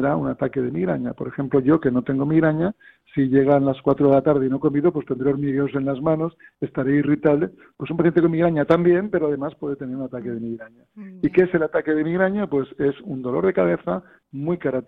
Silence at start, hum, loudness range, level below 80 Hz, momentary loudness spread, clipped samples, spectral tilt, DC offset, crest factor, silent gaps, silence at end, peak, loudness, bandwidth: 0 s; none; 3 LU; -54 dBFS; 12 LU; under 0.1%; -10.5 dB/octave; under 0.1%; 16 dB; none; 0.05 s; -4 dBFS; -21 LUFS; 4.5 kHz